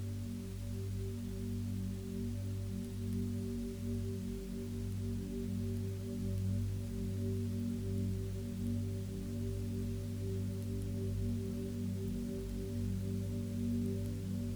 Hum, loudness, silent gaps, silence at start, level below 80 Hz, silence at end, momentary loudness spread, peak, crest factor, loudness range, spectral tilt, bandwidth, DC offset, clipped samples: 50 Hz at -55 dBFS; -40 LUFS; none; 0 s; -48 dBFS; 0 s; 4 LU; -26 dBFS; 12 dB; 2 LU; -7.5 dB/octave; over 20 kHz; under 0.1%; under 0.1%